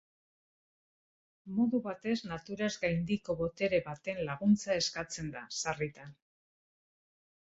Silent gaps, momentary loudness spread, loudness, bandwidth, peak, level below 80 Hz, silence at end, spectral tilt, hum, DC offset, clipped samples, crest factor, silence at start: none; 10 LU; -34 LUFS; 8.2 kHz; -16 dBFS; -64 dBFS; 1.4 s; -5 dB/octave; none; under 0.1%; under 0.1%; 18 dB; 1.45 s